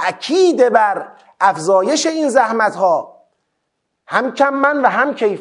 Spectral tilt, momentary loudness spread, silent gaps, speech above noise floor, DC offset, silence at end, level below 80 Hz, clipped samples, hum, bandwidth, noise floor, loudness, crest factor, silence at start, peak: -3.5 dB/octave; 7 LU; none; 58 dB; under 0.1%; 0 s; -72 dBFS; under 0.1%; none; 11 kHz; -72 dBFS; -15 LUFS; 16 dB; 0 s; 0 dBFS